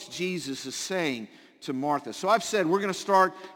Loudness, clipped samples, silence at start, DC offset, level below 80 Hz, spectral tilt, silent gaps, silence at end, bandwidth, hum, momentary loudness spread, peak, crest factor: -27 LUFS; under 0.1%; 0 s; under 0.1%; -74 dBFS; -4 dB/octave; none; 0 s; 17 kHz; none; 12 LU; -8 dBFS; 20 dB